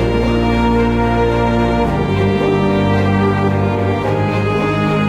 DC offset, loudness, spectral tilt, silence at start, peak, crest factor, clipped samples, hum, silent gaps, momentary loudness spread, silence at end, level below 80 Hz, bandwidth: under 0.1%; -15 LUFS; -8 dB/octave; 0 s; -2 dBFS; 12 dB; under 0.1%; none; none; 2 LU; 0 s; -26 dBFS; 11 kHz